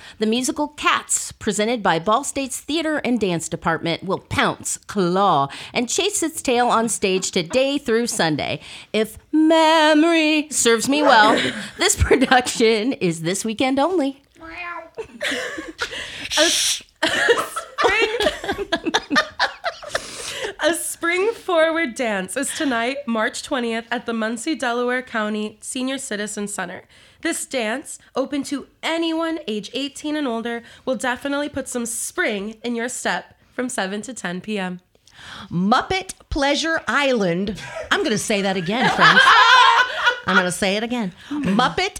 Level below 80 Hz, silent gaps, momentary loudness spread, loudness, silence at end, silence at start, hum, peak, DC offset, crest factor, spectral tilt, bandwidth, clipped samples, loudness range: -46 dBFS; none; 12 LU; -20 LUFS; 0 s; 0 s; none; 0 dBFS; under 0.1%; 20 dB; -3 dB/octave; 19 kHz; under 0.1%; 10 LU